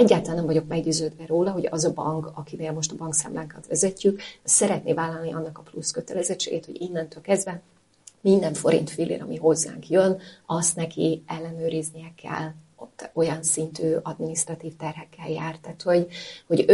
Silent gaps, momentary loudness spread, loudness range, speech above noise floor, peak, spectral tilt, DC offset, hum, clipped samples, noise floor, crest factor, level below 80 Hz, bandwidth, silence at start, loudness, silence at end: none; 13 LU; 4 LU; 29 dB; -4 dBFS; -4.5 dB/octave; under 0.1%; none; under 0.1%; -54 dBFS; 22 dB; -62 dBFS; 11.5 kHz; 0 s; -25 LUFS; 0 s